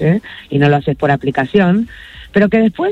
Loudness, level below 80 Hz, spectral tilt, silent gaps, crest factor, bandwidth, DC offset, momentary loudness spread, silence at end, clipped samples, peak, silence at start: -14 LUFS; -42 dBFS; -8.5 dB/octave; none; 12 dB; 7.8 kHz; under 0.1%; 7 LU; 0 s; under 0.1%; 0 dBFS; 0 s